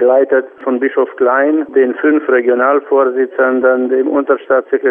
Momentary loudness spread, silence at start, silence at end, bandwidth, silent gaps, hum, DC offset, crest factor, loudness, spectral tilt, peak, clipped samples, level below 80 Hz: 4 LU; 0 s; 0 s; 3.5 kHz; none; none; under 0.1%; 12 dB; -13 LUFS; -8.5 dB/octave; 0 dBFS; under 0.1%; -64 dBFS